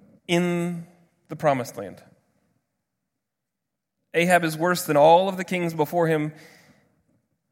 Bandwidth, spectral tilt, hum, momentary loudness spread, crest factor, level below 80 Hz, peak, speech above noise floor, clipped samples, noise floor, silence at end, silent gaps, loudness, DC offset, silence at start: 16.5 kHz; -5.5 dB/octave; none; 17 LU; 20 dB; -72 dBFS; -4 dBFS; 62 dB; under 0.1%; -84 dBFS; 1.2 s; none; -22 LUFS; under 0.1%; 0.3 s